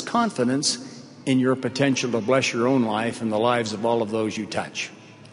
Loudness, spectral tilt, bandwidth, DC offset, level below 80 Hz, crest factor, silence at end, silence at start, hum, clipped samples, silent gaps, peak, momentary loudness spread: -23 LUFS; -4.5 dB/octave; 11 kHz; under 0.1%; -64 dBFS; 16 dB; 0.05 s; 0 s; none; under 0.1%; none; -6 dBFS; 9 LU